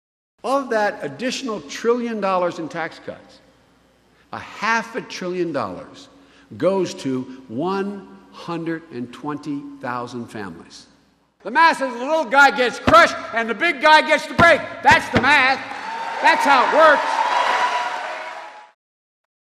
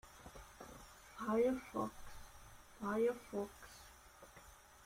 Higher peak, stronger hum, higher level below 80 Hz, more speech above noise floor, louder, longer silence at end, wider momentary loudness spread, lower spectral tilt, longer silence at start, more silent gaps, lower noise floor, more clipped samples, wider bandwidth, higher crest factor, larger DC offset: first, -2 dBFS vs -26 dBFS; neither; first, -52 dBFS vs -64 dBFS; first, 39 dB vs 23 dB; first, -18 LUFS vs -40 LUFS; first, 0.9 s vs 0 s; second, 18 LU vs 23 LU; second, -4 dB/octave vs -5.5 dB/octave; first, 0.45 s vs 0.05 s; neither; about the same, -58 dBFS vs -61 dBFS; neither; second, 14 kHz vs 16 kHz; about the same, 18 dB vs 18 dB; neither